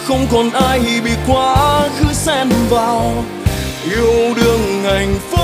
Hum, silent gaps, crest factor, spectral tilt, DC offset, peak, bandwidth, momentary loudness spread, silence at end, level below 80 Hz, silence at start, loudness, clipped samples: none; none; 12 dB; -5 dB/octave; under 0.1%; -2 dBFS; 16 kHz; 6 LU; 0 s; -26 dBFS; 0 s; -14 LUFS; under 0.1%